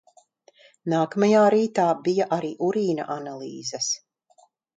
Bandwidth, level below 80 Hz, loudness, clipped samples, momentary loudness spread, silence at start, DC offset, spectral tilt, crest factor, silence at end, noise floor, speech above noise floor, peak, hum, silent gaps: 9.2 kHz; -72 dBFS; -23 LUFS; under 0.1%; 14 LU; 0.85 s; under 0.1%; -4.5 dB/octave; 18 dB; 0.8 s; -61 dBFS; 38 dB; -8 dBFS; none; none